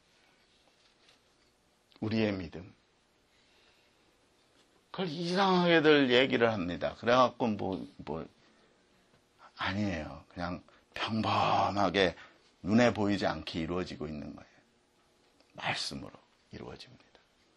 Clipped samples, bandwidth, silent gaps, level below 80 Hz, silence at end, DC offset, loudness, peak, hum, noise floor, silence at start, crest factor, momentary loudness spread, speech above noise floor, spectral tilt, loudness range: under 0.1%; 11.5 kHz; none; -62 dBFS; 0.75 s; under 0.1%; -30 LUFS; -10 dBFS; none; -70 dBFS; 2 s; 22 dB; 22 LU; 39 dB; -5.5 dB/octave; 12 LU